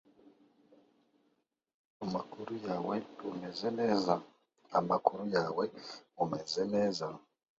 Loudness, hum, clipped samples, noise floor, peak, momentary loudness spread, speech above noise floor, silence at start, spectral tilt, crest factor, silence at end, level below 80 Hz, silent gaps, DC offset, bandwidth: -35 LUFS; none; under 0.1%; -79 dBFS; -8 dBFS; 11 LU; 45 dB; 0.25 s; -4.5 dB/octave; 28 dB; 0.4 s; -76 dBFS; 1.74-2.00 s; under 0.1%; 7.6 kHz